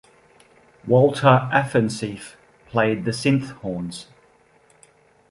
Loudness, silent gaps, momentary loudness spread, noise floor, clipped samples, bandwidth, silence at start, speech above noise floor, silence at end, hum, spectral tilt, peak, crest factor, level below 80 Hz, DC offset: -20 LUFS; none; 20 LU; -57 dBFS; under 0.1%; 11.5 kHz; 0.85 s; 37 dB; 1.25 s; none; -6.5 dB/octave; -2 dBFS; 20 dB; -58 dBFS; under 0.1%